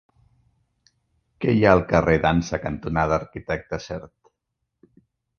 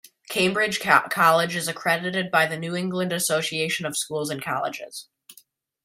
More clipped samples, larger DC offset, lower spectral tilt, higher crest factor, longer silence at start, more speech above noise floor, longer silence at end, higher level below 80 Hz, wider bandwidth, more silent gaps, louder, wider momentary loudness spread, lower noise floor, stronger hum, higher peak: neither; neither; first, -7 dB/octave vs -3 dB/octave; about the same, 24 dB vs 24 dB; first, 1.4 s vs 0.3 s; first, 58 dB vs 34 dB; first, 1.3 s vs 0.5 s; first, -42 dBFS vs -68 dBFS; second, 6.8 kHz vs 16 kHz; neither; about the same, -22 LUFS vs -23 LUFS; first, 14 LU vs 10 LU; first, -79 dBFS vs -57 dBFS; neither; about the same, 0 dBFS vs -2 dBFS